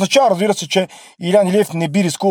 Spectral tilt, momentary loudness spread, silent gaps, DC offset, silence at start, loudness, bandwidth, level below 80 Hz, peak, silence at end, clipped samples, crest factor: -4.5 dB/octave; 6 LU; none; under 0.1%; 0 s; -16 LUFS; 19.5 kHz; -64 dBFS; 0 dBFS; 0 s; under 0.1%; 14 dB